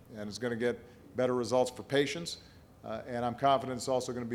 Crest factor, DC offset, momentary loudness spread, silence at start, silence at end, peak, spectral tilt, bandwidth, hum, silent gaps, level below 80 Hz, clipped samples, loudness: 20 dB; under 0.1%; 13 LU; 0.05 s; 0 s; -14 dBFS; -4.5 dB/octave; 16 kHz; none; none; -64 dBFS; under 0.1%; -33 LUFS